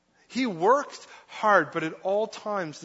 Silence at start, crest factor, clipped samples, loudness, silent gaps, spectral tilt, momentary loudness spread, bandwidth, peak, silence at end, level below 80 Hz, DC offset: 0.3 s; 20 dB; under 0.1%; -26 LUFS; none; -4.5 dB/octave; 16 LU; 8 kHz; -6 dBFS; 0 s; -78 dBFS; under 0.1%